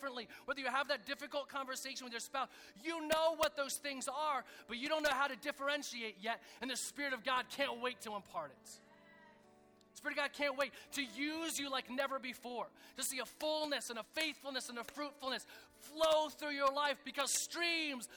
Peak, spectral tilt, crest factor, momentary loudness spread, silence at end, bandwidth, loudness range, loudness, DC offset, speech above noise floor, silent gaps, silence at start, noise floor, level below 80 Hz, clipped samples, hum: -22 dBFS; -1 dB/octave; 18 dB; 11 LU; 0 s; over 20 kHz; 5 LU; -39 LUFS; under 0.1%; 26 dB; none; 0 s; -66 dBFS; -76 dBFS; under 0.1%; none